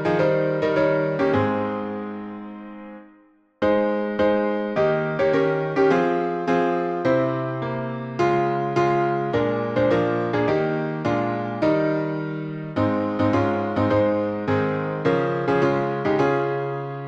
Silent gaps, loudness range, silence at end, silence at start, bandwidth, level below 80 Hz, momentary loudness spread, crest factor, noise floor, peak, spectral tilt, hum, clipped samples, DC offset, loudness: none; 3 LU; 0 s; 0 s; 8 kHz; -56 dBFS; 8 LU; 14 dB; -55 dBFS; -8 dBFS; -8 dB/octave; none; under 0.1%; under 0.1%; -22 LUFS